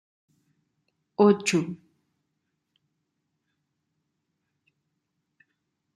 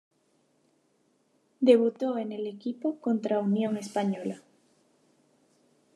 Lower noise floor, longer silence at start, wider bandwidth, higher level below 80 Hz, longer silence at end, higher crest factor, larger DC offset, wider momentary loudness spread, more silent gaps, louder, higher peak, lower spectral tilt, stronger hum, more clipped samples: first, -79 dBFS vs -70 dBFS; second, 1.2 s vs 1.6 s; about the same, 13 kHz vs 12 kHz; first, -76 dBFS vs -88 dBFS; first, 4.2 s vs 1.55 s; about the same, 24 dB vs 22 dB; neither; first, 18 LU vs 13 LU; neither; first, -23 LUFS vs -28 LUFS; about the same, -6 dBFS vs -8 dBFS; second, -5.5 dB/octave vs -7 dB/octave; neither; neither